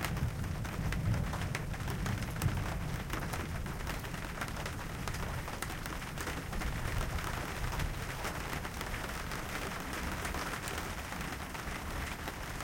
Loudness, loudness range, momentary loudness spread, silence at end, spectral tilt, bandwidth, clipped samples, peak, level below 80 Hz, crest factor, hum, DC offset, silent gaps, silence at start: -38 LUFS; 2 LU; 5 LU; 0 s; -4.5 dB/octave; 17 kHz; under 0.1%; -18 dBFS; -42 dBFS; 20 dB; none; under 0.1%; none; 0 s